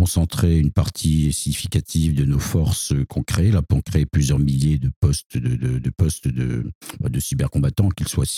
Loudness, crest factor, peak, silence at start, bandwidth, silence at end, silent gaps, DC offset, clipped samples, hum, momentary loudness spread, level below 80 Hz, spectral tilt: -21 LUFS; 14 dB; -4 dBFS; 0 s; 16 kHz; 0 s; 4.96-5.02 s, 5.26-5.30 s, 6.75-6.81 s; under 0.1%; under 0.1%; none; 5 LU; -30 dBFS; -6 dB/octave